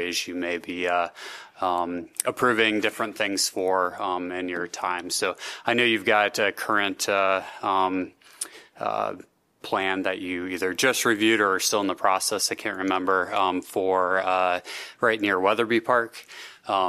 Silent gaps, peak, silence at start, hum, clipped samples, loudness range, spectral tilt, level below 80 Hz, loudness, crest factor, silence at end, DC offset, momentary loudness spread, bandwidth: none; -2 dBFS; 0 s; none; under 0.1%; 4 LU; -2.5 dB/octave; -70 dBFS; -24 LUFS; 22 dB; 0 s; under 0.1%; 11 LU; 15 kHz